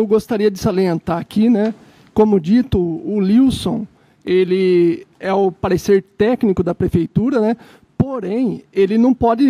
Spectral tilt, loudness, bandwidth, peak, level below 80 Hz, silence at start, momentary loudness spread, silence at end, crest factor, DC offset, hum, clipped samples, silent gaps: -7.5 dB/octave; -17 LUFS; 15 kHz; -2 dBFS; -42 dBFS; 0 s; 8 LU; 0 s; 14 dB; under 0.1%; none; under 0.1%; none